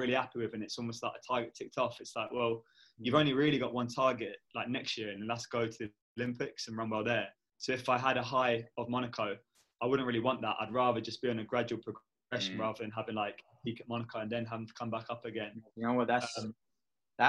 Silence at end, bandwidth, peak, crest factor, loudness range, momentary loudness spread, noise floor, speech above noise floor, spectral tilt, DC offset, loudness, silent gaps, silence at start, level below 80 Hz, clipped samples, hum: 0 s; 12 kHz; -12 dBFS; 24 dB; 5 LU; 11 LU; under -90 dBFS; over 55 dB; -5 dB/octave; under 0.1%; -35 LUFS; 6.02-6.16 s; 0 s; -72 dBFS; under 0.1%; none